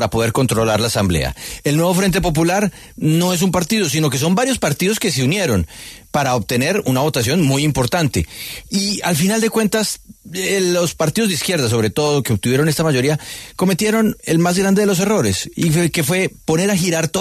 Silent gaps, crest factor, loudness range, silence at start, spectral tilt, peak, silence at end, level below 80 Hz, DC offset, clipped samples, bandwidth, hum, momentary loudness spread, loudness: none; 12 dB; 1 LU; 0 s; -4.5 dB/octave; -4 dBFS; 0 s; -40 dBFS; under 0.1%; under 0.1%; 14 kHz; none; 6 LU; -17 LUFS